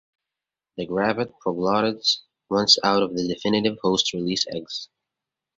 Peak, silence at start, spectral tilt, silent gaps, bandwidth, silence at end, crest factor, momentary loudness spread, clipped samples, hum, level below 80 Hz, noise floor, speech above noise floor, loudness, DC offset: -2 dBFS; 0.75 s; -3.5 dB/octave; none; 8 kHz; 0.7 s; 22 dB; 14 LU; under 0.1%; none; -60 dBFS; -88 dBFS; 65 dB; -22 LUFS; under 0.1%